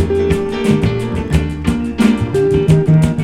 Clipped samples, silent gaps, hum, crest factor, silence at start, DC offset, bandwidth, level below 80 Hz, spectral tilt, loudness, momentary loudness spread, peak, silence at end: under 0.1%; none; none; 14 dB; 0 s; under 0.1%; 12.5 kHz; -26 dBFS; -7.5 dB/octave; -14 LUFS; 7 LU; 0 dBFS; 0 s